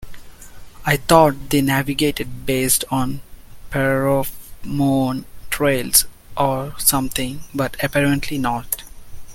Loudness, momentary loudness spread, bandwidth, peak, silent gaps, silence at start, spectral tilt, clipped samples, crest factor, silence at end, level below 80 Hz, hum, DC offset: -19 LUFS; 13 LU; 17 kHz; 0 dBFS; none; 0 s; -4 dB/octave; under 0.1%; 20 dB; 0 s; -38 dBFS; none; under 0.1%